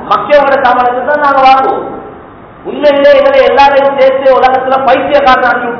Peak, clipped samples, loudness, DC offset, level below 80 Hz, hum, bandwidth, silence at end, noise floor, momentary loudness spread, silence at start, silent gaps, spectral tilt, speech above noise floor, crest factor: 0 dBFS; 8%; -7 LUFS; under 0.1%; -40 dBFS; none; 5.4 kHz; 0 s; -31 dBFS; 8 LU; 0 s; none; -5.5 dB/octave; 24 dB; 8 dB